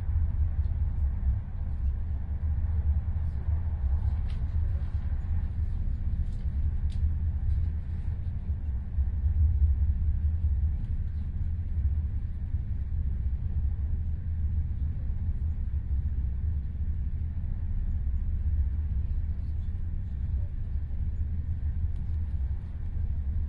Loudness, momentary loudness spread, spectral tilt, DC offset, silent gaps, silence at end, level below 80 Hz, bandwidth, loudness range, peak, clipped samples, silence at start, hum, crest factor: -32 LUFS; 5 LU; -10.5 dB/octave; under 0.1%; none; 0 s; -30 dBFS; 2.4 kHz; 3 LU; -14 dBFS; under 0.1%; 0 s; none; 14 dB